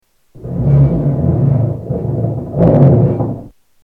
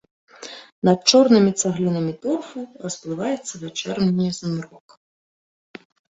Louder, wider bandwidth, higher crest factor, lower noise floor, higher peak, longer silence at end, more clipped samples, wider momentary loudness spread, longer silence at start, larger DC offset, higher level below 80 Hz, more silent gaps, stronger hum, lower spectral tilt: first, -13 LUFS vs -20 LUFS; second, 2.5 kHz vs 8.2 kHz; second, 12 dB vs 20 dB; second, -32 dBFS vs under -90 dBFS; about the same, 0 dBFS vs -2 dBFS; second, 0.35 s vs 1.45 s; neither; second, 12 LU vs 21 LU; about the same, 0.35 s vs 0.4 s; neither; first, -30 dBFS vs -62 dBFS; second, none vs 0.72-0.82 s; neither; first, -12.5 dB/octave vs -5 dB/octave